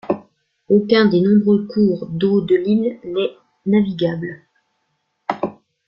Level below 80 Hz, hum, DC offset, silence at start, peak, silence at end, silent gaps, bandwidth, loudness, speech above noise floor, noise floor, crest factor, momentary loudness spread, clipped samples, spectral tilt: -58 dBFS; none; under 0.1%; 0.05 s; -2 dBFS; 0.35 s; none; 5.8 kHz; -18 LUFS; 54 dB; -70 dBFS; 16 dB; 14 LU; under 0.1%; -9.5 dB/octave